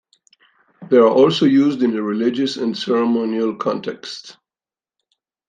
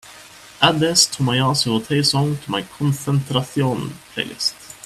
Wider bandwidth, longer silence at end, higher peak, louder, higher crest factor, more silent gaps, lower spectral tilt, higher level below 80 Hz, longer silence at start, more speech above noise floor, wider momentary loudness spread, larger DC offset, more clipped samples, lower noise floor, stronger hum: second, 9.4 kHz vs 14.5 kHz; first, 1.15 s vs 0.1 s; about the same, -2 dBFS vs 0 dBFS; about the same, -17 LUFS vs -19 LUFS; about the same, 18 dB vs 20 dB; neither; first, -6 dB/octave vs -4 dB/octave; second, -66 dBFS vs -54 dBFS; first, 0.8 s vs 0.05 s; first, over 73 dB vs 23 dB; first, 14 LU vs 11 LU; neither; neither; first, under -90 dBFS vs -42 dBFS; neither